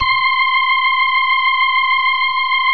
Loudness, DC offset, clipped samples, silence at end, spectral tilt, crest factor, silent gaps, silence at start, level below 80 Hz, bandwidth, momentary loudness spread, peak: -13 LUFS; 1%; under 0.1%; 0 s; -2 dB/octave; 12 dB; none; 0 s; -52 dBFS; 5.6 kHz; 1 LU; -4 dBFS